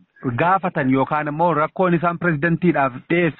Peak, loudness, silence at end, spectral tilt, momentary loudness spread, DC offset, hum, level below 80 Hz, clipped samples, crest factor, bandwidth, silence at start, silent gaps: -6 dBFS; -19 LUFS; 0.1 s; -6.5 dB/octave; 3 LU; under 0.1%; none; -52 dBFS; under 0.1%; 14 dB; 4.2 kHz; 0.2 s; none